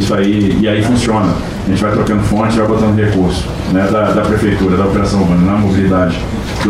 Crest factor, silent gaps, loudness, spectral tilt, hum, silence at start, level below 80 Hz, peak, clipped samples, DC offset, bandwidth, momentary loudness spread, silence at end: 10 dB; none; -12 LUFS; -7 dB/octave; none; 0 s; -26 dBFS; -2 dBFS; under 0.1%; under 0.1%; 13.5 kHz; 4 LU; 0 s